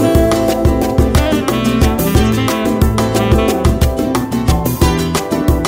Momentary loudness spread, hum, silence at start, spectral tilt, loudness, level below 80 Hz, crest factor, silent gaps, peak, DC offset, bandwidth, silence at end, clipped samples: 3 LU; none; 0 s; -6 dB/octave; -14 LUFS; -20 dBFS; 12 dB; none; 0 dBFS; under 0.1%; 16.5 kHz; 0 s; under 0.1%